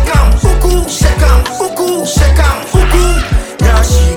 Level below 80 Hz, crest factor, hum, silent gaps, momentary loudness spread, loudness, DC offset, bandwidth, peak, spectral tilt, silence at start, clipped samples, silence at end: -10 dBFS; 8 dB; none; none; 5 LU; -11 LUFS; under 0.1%; 17 kHz; 0 dBFS; -5 dB/octave; 0 s; 0.2%; 0 s